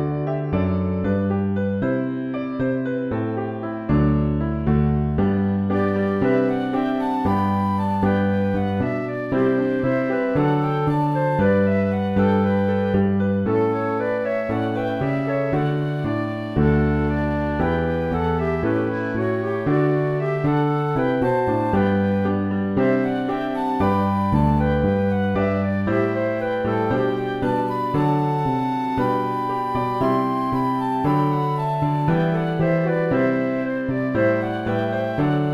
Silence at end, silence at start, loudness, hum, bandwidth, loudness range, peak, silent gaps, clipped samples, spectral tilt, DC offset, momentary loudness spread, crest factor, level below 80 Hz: 0 s; 0 s; -21 LUFS; none; 11 kHz; 2 LU; -6 dBFS; none; under 0.1%; -9.5 dB/octave; under 0.1%; 4 LU; 14 dB; -38 dBFS